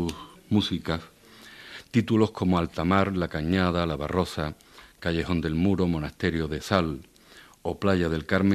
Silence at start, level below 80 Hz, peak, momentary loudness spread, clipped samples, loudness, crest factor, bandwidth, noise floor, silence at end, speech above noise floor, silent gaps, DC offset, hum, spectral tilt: 0 s; -46 dBFS; -4 dBFS; 12 LU; under 0.1%; -26 LUFS; 22 dB; 13.5 kHz; -52 dBFS; 0 s; 27 dB; none; under 0.1%; none; -6.5 dB/octave